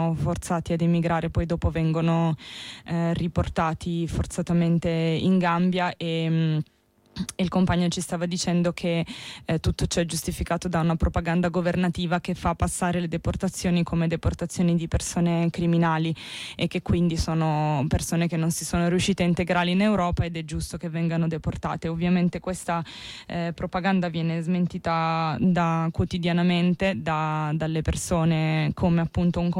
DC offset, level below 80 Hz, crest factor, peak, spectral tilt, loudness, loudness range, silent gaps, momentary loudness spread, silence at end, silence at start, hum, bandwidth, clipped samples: under 0.1%; -40 dBFS; 12 dB; -12 dBFS; -6 dB/octave; -25 LUFS; 2 LU; none; 7 LU; 0 s; 0 s; none; 14.5 kHz; under 0.1%